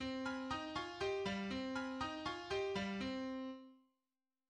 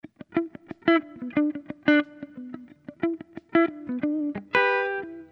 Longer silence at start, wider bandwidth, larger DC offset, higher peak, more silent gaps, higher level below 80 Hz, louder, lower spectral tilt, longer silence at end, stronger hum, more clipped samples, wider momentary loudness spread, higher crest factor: second, 0 s vs 0.3 s; first, 10 kHz vs 6 kHz; neither; second, -28 dBFS vs -4 dBFS; neither; about the same, -66 dBFS vs -70 dBFS; second, -43 LUFS vs -26 LUFS; second, -5 dB/octave vs -7 dB/octave; first, 0.7 s vs 0.05 s; neither; neither; second, 5 LU vs 17 LU; second, 14 dB vs 22 dB